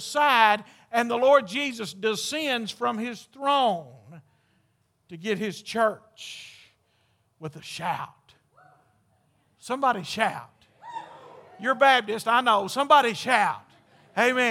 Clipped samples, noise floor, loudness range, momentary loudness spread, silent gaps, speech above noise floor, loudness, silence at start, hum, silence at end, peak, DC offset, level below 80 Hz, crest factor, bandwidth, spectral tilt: under 0.1%; -69 dBFS; 10 LU; 21 LU; none; 45 dB; -24 LUFS; 0 s; none; 0 s; -4 dBFS; under 0.1%; -78 dBFS; 22 dB; 16.5 kHz; -3 dB/octave